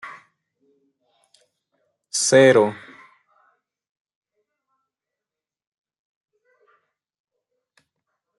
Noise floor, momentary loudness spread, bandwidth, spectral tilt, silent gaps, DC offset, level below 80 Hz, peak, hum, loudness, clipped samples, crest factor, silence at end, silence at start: -89 dBFS; 27 LU; 11.5 kHz; -3.5 dB/octave; none; under 0.1%; -74 dBFS; -2 dBFS; none; -16 LUFS; under 0.1%; 24 dB; 5.65 s; 0.05 s